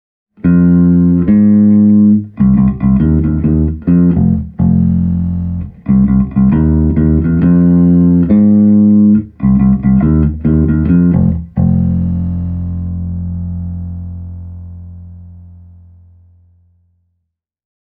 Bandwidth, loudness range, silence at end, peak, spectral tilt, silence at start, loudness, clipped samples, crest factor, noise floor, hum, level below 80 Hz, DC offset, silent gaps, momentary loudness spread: 2.7 kHz; 14 LU; 2.4 s; 0 dBFS; -14.5 dB/octave; 0.45 s; -11 LUFS; under 0.1%; 10 dB; -71 dBFS; none; -24 dBFS; under 0.1%; none; 13 LU